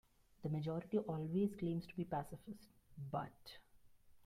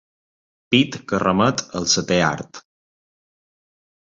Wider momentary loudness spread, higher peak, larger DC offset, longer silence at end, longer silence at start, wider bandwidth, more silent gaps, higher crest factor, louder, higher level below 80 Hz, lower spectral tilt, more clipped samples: first, 19 LU vs 6 LU; second, -26 dBFS vs -2 dBFS; neither; second, 0.05 s vs 1.45 s; second, 0.4 s vs 0.7 s; first, 15.5 kHz vs 7.8 kHz; neither; about the same, 18 dB vs 20 dB; second, -43 LUFS vs -19 LUFS; second, -70 dBFS vs -52 dBFS; first, -8.5 dB/octave vs -4 dB/octave; neither